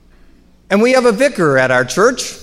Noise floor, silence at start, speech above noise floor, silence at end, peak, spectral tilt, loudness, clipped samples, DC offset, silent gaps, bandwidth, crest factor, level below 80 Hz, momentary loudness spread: -45 dBFS; 0.7 s; 33 dB; 0 s; 0 dBFS; -4.5 dB/octave; -13 LUFS; under 0.1%; under 0.1%; none; 15 kHz; 14 dB; -46 dBFS; 3 LU